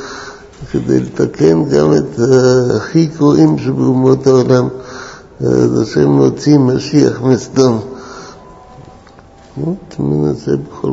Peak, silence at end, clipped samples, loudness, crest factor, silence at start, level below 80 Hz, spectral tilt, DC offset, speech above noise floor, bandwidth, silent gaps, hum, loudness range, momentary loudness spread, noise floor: 0 dBFS; 0 s; 0.1%; -12 LUFS; 12 dB; 0 s; -42 dBFS; -7 dB/octave; under 0.1%; 28 dB; 8 kHz; none; none; 7 LU; 19 LU; -40 dBFS